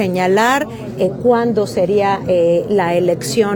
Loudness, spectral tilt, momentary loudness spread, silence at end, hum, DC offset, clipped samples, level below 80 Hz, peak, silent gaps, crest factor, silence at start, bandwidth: -15 LUFS; -5.5 dB/octave; 5 LU; 0 s; none; under 0.1%; under 0.1%; -50 dBFS; -2 dBFS; none; 14 dB; 0 s; 19 kHz